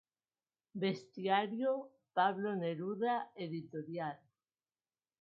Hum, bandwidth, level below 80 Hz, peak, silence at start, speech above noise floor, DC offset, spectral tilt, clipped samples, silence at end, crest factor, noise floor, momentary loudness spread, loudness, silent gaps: none; 6.8 kHz; -88 dBFS; -20 dBFS; 0.75 s; over 53 dB; under 0.1%; -4 dB/octave; under 0.1%; 1.05 s; 20 dB; under -90 dBFS; 10 LU; -38 LUFS; none